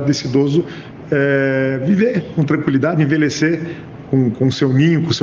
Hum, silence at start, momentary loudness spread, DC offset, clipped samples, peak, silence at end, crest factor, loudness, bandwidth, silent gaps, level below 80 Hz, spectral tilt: none; 0 s; 7 LU; under 0.1%; under 0.1%; -2 dBFS; 0 s; 14 dB; -16 LUFS; 7.6 kHz; none; -52 dBFS; -6.5 dB/octave